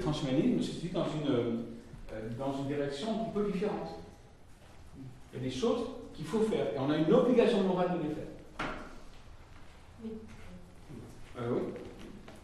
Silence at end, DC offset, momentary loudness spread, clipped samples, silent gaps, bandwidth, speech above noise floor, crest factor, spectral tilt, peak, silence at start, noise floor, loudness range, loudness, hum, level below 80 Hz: 0 s; under 0.1%; 23 LU; under 0.1%; none; 12.5 kHz; 23 dB; 22 dB; -7 dB/octave; -12 dBFS; 0 s; -54 dBFS; 12 LU; -33 LUFS; none; -54 dBFS